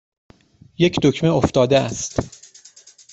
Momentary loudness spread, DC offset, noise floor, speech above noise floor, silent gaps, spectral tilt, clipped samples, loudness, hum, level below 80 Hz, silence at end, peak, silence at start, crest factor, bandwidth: 10 LU; under 0.1%; -48 dBFS; 30 dB; none; -5.5 dB/octave; under 0.1%; -18 LUFS; none; -46 dBFS; 0.85 s; -2 dBFS; 0.8 s; 18 dB; 8.4 kHz